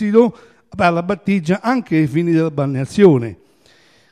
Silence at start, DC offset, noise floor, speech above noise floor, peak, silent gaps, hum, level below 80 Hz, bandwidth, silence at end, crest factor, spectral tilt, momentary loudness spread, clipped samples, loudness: 0 s; under 0.1%; -52 dBFS; 37 dB; 0 dBFS; none; none; -52 dBFS; 12 kHz; 0.8 s; 16 dB; -8 dB/octave; 8 LU; under 0.1%; -16 LUFS